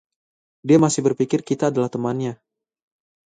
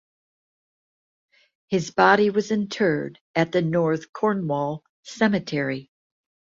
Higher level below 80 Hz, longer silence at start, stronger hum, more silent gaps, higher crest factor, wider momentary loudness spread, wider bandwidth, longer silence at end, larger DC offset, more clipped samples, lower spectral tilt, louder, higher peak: about the same, -62 dBFS vs -64 dBFS; second, 0.65 s vs 1.7 s; neither; second, none vs 3.21-3.34 s, 4.09-4.13 s, 4.89-5.03 s; about the same, 18 dB vs 22 dB; about the same, 11 LU vs 11 LU; first, 9.4 kHz vs 7.8 kHz; first, 0.9 s vs 0.75 s; neither; neither; about the same, -6 dB/octave vs -6 dB/octave; first, -20 LUFS vs -23 LUFS; about the same, -4 dBFS vs -4 dBFS